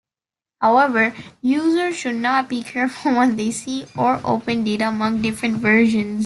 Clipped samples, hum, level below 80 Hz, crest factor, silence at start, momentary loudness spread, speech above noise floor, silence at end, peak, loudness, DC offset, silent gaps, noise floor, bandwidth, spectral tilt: under 0.1%; none; -56 dBFS; 16 dB; 0.6 s; 8 LU; over 71 dB; 0 s; -4 dBFS; -19 LUFS; under 0.1%; none; under -90 dBFS; 12 kHz; -5 dB/octave